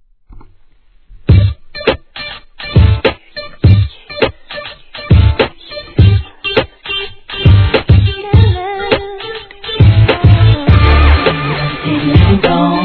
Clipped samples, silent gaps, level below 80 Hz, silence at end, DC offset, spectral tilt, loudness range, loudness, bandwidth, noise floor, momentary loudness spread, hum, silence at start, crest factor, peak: 0.9%; none; -18 dBFS; 0 s; 0.2%; -9.5 dB/octave; 4 LU; -11 LUFS; 4.6 kHz; -44 dBFS; 16 LU; none; 0.3 s; 10 dB; 0 dBFS